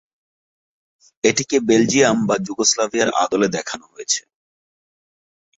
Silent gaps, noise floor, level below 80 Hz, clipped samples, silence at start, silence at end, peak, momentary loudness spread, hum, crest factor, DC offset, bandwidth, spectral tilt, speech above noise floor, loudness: none; under -90 dBFS; -60 dBFS; under 0.1%; 1.25 s; 1.4 s; -2 dBFS; 7 LU; none; 20 dB; under 0.1%; 8.2 kHz; -3 dB/octave; over 72 dB; -18 LUFS